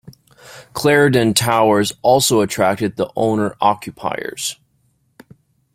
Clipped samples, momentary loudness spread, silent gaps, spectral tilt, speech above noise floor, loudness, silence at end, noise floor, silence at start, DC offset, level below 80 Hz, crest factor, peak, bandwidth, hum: under 0.1%; 11 LU; none; -4 dB/octave; 46 dB; -16 LUFS; 1.2 s; -62 dBFS; 0.05 s; under 0.1%; -54 dBFS; 18 dB; 0 dBFS; 16.5 kHz; none